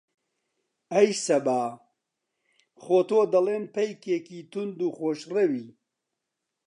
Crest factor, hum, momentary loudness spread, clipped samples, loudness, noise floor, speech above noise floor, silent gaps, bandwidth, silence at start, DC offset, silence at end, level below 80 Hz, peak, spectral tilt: 20 dB; none; 12 LU; under 0.1%; -26 LUFS; -84 dBFS; 59 dB; none; 11 kHz; 0.9 s; under 0.1%; 0.95 s; -84 dBFS; -8 dBFS; -5 dB/octave